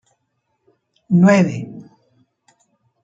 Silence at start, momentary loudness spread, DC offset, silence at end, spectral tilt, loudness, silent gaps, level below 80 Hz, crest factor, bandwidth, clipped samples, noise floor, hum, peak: 1.1 s; 23 LU; under 0.1%; 1.2 s; -7.5 dB/octave; -15 LUFS; none; -62 dBFS; 18 dB; 7.8 kHz; under 0.1%; -71 dBFS; none; -2 dBFS